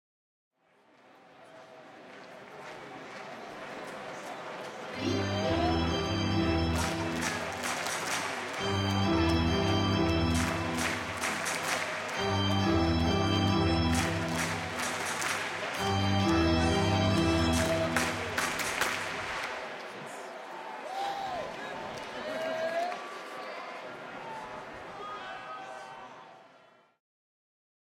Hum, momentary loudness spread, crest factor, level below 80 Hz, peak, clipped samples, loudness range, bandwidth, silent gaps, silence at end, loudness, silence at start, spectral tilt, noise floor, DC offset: none; 16 LU; 20 dB; -50 dBFS; -12 dBFS; under 0.1%; 15 LU; 17 kHz; none; 1.5 s; -31 LUFS; 1.35 s; -4.5 dB/octave; -64 dBFS; under 0.1%